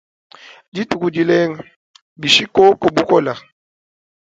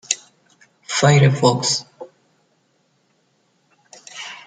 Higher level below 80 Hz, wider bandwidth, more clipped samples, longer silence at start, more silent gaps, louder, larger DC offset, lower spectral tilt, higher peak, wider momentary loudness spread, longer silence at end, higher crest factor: about the same, -56 dBFS vs -58 dBFS; about the same, 9.2 kHz vs 9.6 kHz; neither; first, 0.75 s vs 0.1 s; first, 1.76-1.94 s, 2.02-2.16 s vs none; about the same, -15 LUFS vs -17 LUFS; neither; about the same, -4.5 dB/octave vs -4.5 dB/octave; about the same, 0 dBFS vs 0 dBFS; second, 16 LU vs 27 LU; first, 0.95 s vs 0.1 s; about the same, 18 dB vs 20 dB